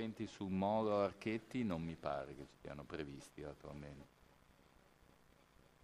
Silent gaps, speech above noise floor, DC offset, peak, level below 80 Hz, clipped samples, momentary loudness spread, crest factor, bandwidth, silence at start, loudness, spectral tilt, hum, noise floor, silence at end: none; 26 dB; under 0.1%; -24 dBFS; -68 dBFS; under 0.1%; 16 LU; 20 dB; 14.5 kHz; 0 s; -43 LUFS; -7 dB/octave; none; -69 dBFS; 1.75 s